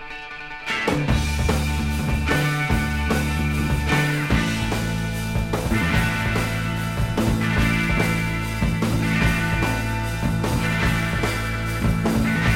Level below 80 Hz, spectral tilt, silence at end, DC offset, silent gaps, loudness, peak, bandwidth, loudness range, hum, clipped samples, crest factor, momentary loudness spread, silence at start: -30 dBFS; -5.5 dB/octave; 0 s; under 0.1%; none; -22 LUFS; -6 dBFS; 16.5 kHz; 1 LU; none; under 0.1%; 14 dB; 5 LU; 0 s